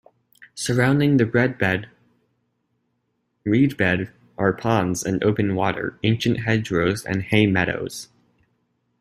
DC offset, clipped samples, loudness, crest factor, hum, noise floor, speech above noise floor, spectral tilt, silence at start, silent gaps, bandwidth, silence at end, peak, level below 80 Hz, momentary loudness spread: under 0.1%; under 0.1%; -21 LUFS; 20 dB; none; -72 dBFS; 52 dB; -6 dB/octave; 0.4 s; none; 15.5 kHz; 0.95 s; -2 dBFS; -52 dBFS; 10 LU